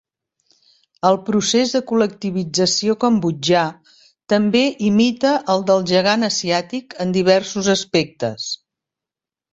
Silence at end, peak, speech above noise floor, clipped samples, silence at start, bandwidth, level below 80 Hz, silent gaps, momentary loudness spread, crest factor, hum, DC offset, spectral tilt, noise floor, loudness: 0.95 s; -2 dBFS; 71 dB; under 0.1%; 1.05 s; 8.2 kHz; -58 dBFS; none; 9 LU; 18 dB; none; under 0.1%; -4.5 dB/octave; -88 dBFS; -18 LUFS